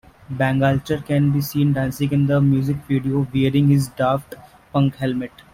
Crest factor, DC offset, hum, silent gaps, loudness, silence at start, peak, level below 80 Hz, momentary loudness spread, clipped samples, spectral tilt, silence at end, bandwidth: 14 dB; under 0.1%; none; none; -20 LUFS; 0.3 s; -4 dBFS; -48 dBFS; 7 LU; under 0.1%; -7.5 dB/octave; 0.25 s; 16 kHz